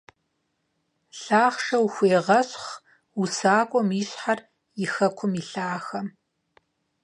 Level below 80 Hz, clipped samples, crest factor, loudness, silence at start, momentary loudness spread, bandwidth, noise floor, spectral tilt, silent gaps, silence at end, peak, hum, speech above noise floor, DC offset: -76 dBFS; under 0.1%; 20 dB; -24 LUFS; 1.15 s; 17 LU; 10.5 kHz; -75 dBFS; -5 dB/octave; none; 0.95 s; -6 dBFS; none; 52 dB; under 0.1%